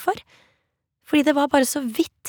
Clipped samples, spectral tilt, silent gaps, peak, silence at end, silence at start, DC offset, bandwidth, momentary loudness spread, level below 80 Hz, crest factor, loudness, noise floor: under 0.1%; -3 dB/octave; none; -2 dBFS; 0 s; 0 s; under 0.1%; over 20 kHz; 8 LU; -62 dBFS; 20 dB; -21 LUFS; -73 dBFS